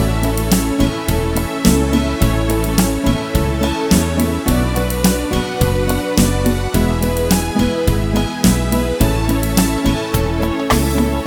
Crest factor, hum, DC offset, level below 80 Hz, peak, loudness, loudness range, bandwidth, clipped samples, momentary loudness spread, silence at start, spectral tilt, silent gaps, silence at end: 16 dB; none; under 0.1%; -22 dBFS; 0 dBFS; -16 LUFS; 1 LU; over 20 kHz; under 0.1%; 3 LU; 0 s; -5.5 dB/octave; none; 0 s